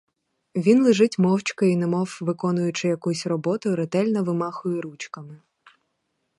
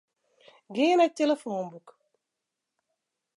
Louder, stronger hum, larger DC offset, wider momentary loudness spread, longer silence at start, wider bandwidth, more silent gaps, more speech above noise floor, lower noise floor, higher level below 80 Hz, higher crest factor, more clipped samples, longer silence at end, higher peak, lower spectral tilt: first, -23 LUFS vs -26 LUFS; neither; neither; about the same, 12 LU vs 14 LU; second, 0.55 s vs 0.7 s; about the same, 11.5 kHz vs 11.5 kHz; neither; second, 53 dB vs 60 dB; second, -75 dBFS vs -86 dBFS; first, -72 dBFS vs -88 dBFS; about the same, 18 dB vs 18 dB; neither; second, 1 s vs 1.6 s; first, -6 dBFS vs -12 dBFS; first, -6.5 dB/octave vs -4.5 dB/octave